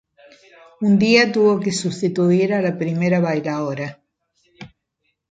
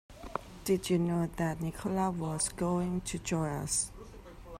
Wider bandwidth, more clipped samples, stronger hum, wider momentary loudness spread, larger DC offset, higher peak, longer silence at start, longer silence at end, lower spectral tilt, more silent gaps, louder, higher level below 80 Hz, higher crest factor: second, 9.4 kHz vs 16 kHz; neither; neither; about the same, 11 LU vs 12 LU; neither; first, -2 dBFS vs -14 dBFS; first, 0.8 s vs 0.1 s; first, 0.65 s vs 0 s; about the same, -6 dB/octave vs -5 dB/octave; neither; first, -18 LUFS vs -33 LUFS; second, -62 dBFS vs -52 dBFS; about the same, 18 dB vs 18 dB